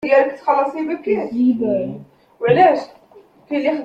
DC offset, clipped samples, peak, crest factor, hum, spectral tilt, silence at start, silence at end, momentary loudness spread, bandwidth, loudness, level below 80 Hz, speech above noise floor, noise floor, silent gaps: under 0.1%; under 0.1%; -2 dBFS; 16 dB; none; -7.5 dB/octave; 0 s; 0 s; 12 LU; 8 kHz; -18 LUFS; -60 dBFS; 31 dB; -48 dBFS; none